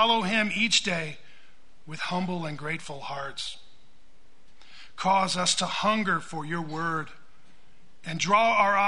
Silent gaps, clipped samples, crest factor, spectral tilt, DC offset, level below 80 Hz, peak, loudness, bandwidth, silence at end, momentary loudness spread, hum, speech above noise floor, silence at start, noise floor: none; under 0.1%; 20 dB; -3 dB/octave; 1%; -62 dBFS; -8 dBFS; -26 LUFS; 10.5 kHz; 0 s; 15 LU; none; 35 dB; 0 s; -62 dBFS